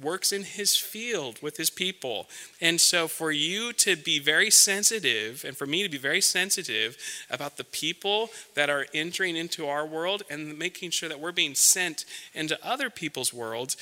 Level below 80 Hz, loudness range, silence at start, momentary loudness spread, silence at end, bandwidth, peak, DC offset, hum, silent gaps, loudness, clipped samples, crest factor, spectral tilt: -80 dBFS; 7 LU; 0 s; 14 LU; 0 s; 17.5 kHz; -4 dBFS; under 0.1%; none; none; -25 LUFS; under 0.1%; 24 dB; -0.5 dB/octave